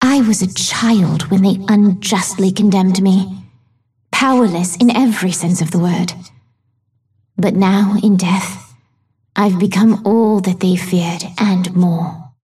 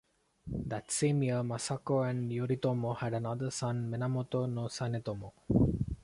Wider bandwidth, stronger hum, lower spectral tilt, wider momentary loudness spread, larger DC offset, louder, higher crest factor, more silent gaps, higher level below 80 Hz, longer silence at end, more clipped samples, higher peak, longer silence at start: first, 14 kHz vs 11.5 kHz; neither; about the same, -5.5 dB/octave vs -6 dB/octave; about the same, 8 LU vs 9 LU; neither; first, -14 LUFS vs -34 LUFS; second, 12 dB vs 20 dB; neither; second, -56 dBFS vs -50 dBFS; about the same, 0.2 s vs 0.1 s; neither; first, -2 dBFS vs -14 dBFS; second, 0 s vs 0.45 s